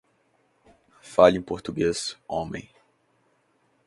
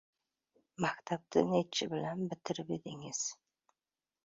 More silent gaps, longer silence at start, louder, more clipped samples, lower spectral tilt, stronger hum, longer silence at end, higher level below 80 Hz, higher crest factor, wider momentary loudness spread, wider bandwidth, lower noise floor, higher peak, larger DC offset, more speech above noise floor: neither; first, 1.05 s vs 0.8 s; first, -24 LUFS vs -36 LUFS; neither; about the same, -5 dB/octave vs -4.5 dB/octave; neither; first, 1.25 s vs 0.9 s; first, -54 dBFS vs -74 dBFS; about the same, 26 dB vs 22 dB; first, 15 LU vs 10 LU; first, 11.5 kHz vs 7.6 kHz; second, -67 dBFS vs under -90 dBFS; first, -2 dBFS vs -16 dBFS; neither; second, 44 dB vs over 54 dB